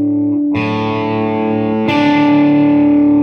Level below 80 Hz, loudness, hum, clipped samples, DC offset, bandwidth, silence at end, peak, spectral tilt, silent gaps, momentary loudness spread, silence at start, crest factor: -48 dBFS; -13 LUFS; none; under 0.1%; under 0.1%; 6.2 kHz; 0 s; -2 dBFS; -8 dB/octave; none; 6 LU; 0 s; 10 dB